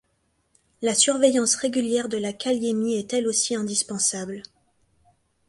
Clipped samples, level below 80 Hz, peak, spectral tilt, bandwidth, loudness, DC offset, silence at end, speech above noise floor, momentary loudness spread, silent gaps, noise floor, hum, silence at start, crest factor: under 0.1%; -68 dBFS; -6 dBFS; -2.5 dB/octave; 11.5 kHz; -23 LUFS; under 0.1%; 1.05 s; 47 dB; 10 LU; none; -70 dBFS; none; 0.8 s; 20 dB